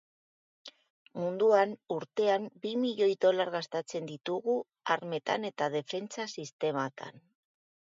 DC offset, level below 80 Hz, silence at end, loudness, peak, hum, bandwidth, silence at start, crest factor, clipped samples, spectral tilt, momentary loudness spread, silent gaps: under 0.1%; -84 dBFS; 0.7 s; -32 LUFS; -12 dBFS; none; 7.8 kHz; 0.65 s; 20 dB; under 0.1%; -5 dB/octave; 16 LU; 0.90-1.05 s, 6.53-6.59 s